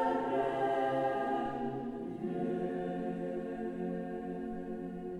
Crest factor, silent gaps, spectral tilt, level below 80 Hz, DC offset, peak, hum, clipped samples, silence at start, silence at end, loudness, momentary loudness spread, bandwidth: 14 dB; none; -8 dB/octave; -62 dBFS; under 0.1%; -20 dBFS; none; under 0.1%; 0 s; 0 s; -36 LUFS; 8 LU; 11 kHz